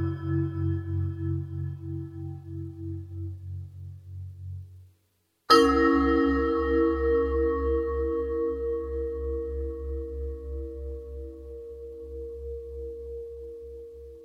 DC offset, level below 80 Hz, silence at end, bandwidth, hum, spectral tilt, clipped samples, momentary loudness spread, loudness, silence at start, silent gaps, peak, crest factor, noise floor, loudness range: under 0.1%; -40 dBFS; 0 s; 13.5 kHz; none; -7 dB/octave; under 0.1%; 19 LU; -28 LUFS; 0 s; none; -6 dBFS; 22 dB; -72 dBFS; 16 LU